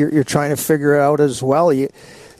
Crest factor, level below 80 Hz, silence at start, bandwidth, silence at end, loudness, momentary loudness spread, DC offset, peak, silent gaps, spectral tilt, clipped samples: 14 dB; -52 dBFS; 0 s; 14.5 kHz; 0.25 s; -16 LUFS; 5 LU; under 0.1%; -2 dBFS; none; -6 dB/octave; under 0.1%